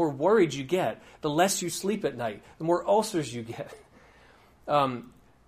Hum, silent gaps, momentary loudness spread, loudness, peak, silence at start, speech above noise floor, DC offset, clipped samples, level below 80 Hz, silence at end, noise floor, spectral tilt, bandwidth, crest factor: none; none; 15 LU; -27 LUFS; -10 dBFS; 0 s; 30 dB; under 0.1%; under 0.1%; -62 dBFS; 0.4 s; -57 dBFS; -4.5 dB/octave; 15.5 kHz; 18 dB